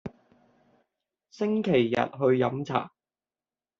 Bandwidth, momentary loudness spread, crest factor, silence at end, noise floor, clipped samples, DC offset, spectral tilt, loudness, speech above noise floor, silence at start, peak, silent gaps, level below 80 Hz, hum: 7.4 kHz; 11 LU; 22 dB; 0.9 s; under -90 dBFS; under 0.1%; under 0.1%; -5.5 dB/octave; -26 LUFS; over 65 dB; 0.05 s; -8 dBFS; none; -68 dBFS; none